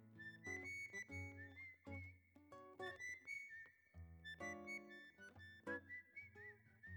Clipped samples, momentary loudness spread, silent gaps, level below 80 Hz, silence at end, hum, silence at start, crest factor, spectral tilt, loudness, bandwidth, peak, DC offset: under 0.1%; 13 LU; none; -76 dBFS; 0 s; none; 0 s; 18 dB; -4.5 dB/octave; -54 LUFS; over 20 kHz; -38 dBFS; under 0.1%